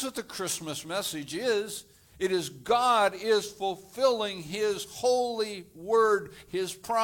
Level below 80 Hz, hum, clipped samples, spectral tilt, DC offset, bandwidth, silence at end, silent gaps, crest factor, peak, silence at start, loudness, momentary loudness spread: -66 dBFS; none; under 0.1%; -3 dB/octave; under 0.1%; 18.5 kHz; 0 s; none; 18 dB; -10 dBFS; 0 s; -29 LUFS; 10 LU